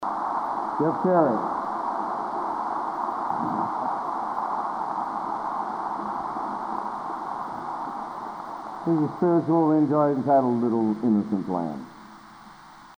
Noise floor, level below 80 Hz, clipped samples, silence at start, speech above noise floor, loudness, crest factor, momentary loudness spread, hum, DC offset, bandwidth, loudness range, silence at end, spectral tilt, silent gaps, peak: -47 dBFS; -66 dBFS; under 0.1%; 0 s; 25 dB; -26 LUFS; 18 dB; 12 LU; none; under 0.1%; 10 kHz; 8 LU; 0 s; -8.5 dB/octave; none; -8 dBFS